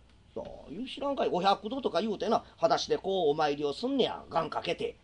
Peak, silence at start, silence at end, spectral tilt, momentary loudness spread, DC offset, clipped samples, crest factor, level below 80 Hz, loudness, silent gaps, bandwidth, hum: -12 dBFS; 0.35 s; 0.1 s; -5 dB/octave; 14 LU; under 0.1%; under 0.1%; 20 dB; -62 dBFS; -30 LUFS; none; 10 kHz; none